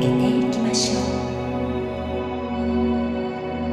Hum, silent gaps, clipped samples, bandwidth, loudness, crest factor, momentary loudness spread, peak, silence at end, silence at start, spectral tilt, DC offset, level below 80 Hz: none; none; under 0.1%; 11.5 kHz; -23 LUFS; 14 dB; 7 LU; -8 dBFS; 0 s; 0 s; -5 dB/octave; under 0.1%; -38 dBFS